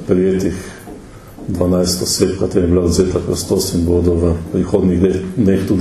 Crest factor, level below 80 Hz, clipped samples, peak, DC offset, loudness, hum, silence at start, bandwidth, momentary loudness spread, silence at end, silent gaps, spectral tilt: 14 dB; -32 dBFS; under 0.1%; 0 dBFS; under 0.1%; -15 LUFS; none; 0 s; 14 kHz; 13 LU; 0 s; none; -6 dB/octave